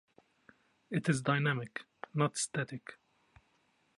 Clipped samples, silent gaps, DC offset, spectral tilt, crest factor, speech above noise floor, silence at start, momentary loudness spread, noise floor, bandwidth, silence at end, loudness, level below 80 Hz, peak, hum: under 0.1%; none; under 0.1%; -5 dB/octave; 22 dB; 40 dB; 0.9 s; 14 LU; -74 dBFS; 11.5 kHz; 1.05 s; -34 LUFS; -74 dBFS; -16 dBFS; none